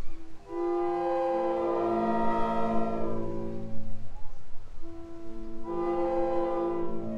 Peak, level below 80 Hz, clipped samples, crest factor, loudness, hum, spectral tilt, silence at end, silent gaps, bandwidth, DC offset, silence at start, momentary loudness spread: -14 dBFS; -42 dBFS; under 0.1%; 12 dB; -30 LUFS; none; -8 dB/octave; 0 s; none; 5.8 kHz; under 0.1%; 0 s; 19 LU